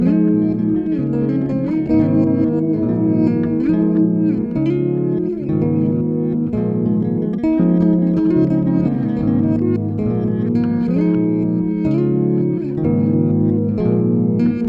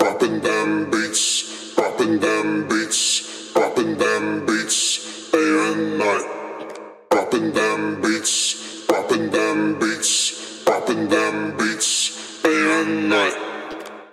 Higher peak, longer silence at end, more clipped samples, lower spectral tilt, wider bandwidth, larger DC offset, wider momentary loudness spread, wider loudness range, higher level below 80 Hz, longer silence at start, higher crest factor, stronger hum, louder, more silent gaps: about the same, -4 dBFS vs -2 dBFS; about the same, 0 s vs 0.05 s; neither; first, -12 dB/octave vs -2 dB/octave; second, 4.7 kHz vs 15 kHz; neither; about the same, 4 LU vs 6 LU; about the same, 1 LU vs 2 LU; first, -44 dBFS vs -68 dBFS; about the same, 0 s vs 0 s; second, 12 dB vs 18 dB; neither; first, -17 LUFS vs -20 LUFS; neither